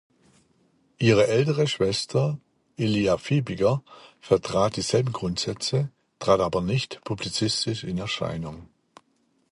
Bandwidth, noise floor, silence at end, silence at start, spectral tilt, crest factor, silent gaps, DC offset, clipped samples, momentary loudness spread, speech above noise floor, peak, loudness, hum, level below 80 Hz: 11.5 kHz; -68 dBFS; 0.9 s; 1 s; -5.5 dB/octave; 20 dB; none; under 0.1%; under 0.1%; 10 LU; 44 dB; -6 dBFS; -25 LUFS; none; -52 dBFS